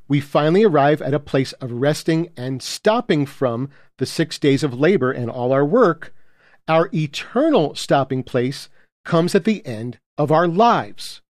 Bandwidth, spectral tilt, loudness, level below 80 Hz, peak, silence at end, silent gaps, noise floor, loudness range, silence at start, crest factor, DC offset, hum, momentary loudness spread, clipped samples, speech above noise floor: 15 kHz; -6 dB/octave; -19 LUFS; -60 dBFS; -4 dBFS; 0.15 s; 8.92-9.04 s, 10.06-10.17 s; -47 dBFS; 2 LU; 0.1 s; 16 dB; under 0.1%; none; 13 LU; under 0.1%; 29 dB